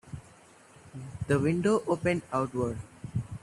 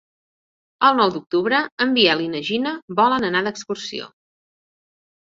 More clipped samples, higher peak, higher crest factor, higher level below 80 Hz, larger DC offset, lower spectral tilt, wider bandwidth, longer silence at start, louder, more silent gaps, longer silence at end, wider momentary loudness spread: neither; second, -12 dBFS vs -2 dBFS; about the same, 18 dB vs 20 dB; first, -56 dBFS vs -64 dBFS; neither; first, -7 dB/octave vs -4 dB/octave; first, 12.5 kHz vs 7.8 kHz; second, 0.05 s vs 0.8 s; second, -30 LUFS vs -19 LUFS; second, none vs 1.72-1.77 s, 2.82-2.88 s; second, 0.05 s vs 1.35 s; first, 19 LU vs 12 LU